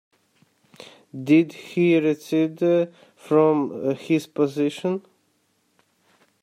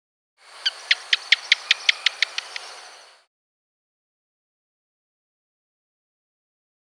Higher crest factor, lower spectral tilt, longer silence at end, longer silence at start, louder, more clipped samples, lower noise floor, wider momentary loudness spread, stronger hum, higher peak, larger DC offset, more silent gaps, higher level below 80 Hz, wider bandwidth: second, 18 dB vs 28 dB; first, -7 dB/octave vs 5.5 dB/octave; second, 1.45 s vs 4.1 s; first, 1.15 s vs 0.55 s; about the same, -22 LUFS vs -20 LUFS; neither; first, -67 dBFS vs -46 dBFS; second, 9 LU vs 17 LU; neither; second, -6 dBFS vs 0 dBFS; neither; neither; first, -74 dBFS vs under -90 dBFS; second, 14 kHz vs 15.5 kHz